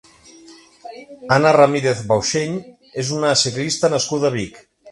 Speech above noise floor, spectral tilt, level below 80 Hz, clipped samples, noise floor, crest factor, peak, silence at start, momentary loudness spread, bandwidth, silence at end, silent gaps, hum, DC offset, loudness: 27 dB; -4 dB/octave; -54 dBFS; under 0.1%; -45 dBFS; 20 dB; 0 dBFS; 0.5 s; 19 LU; 11.5 kHz; 0 s; none; none; under 0.1%; -17 LUFS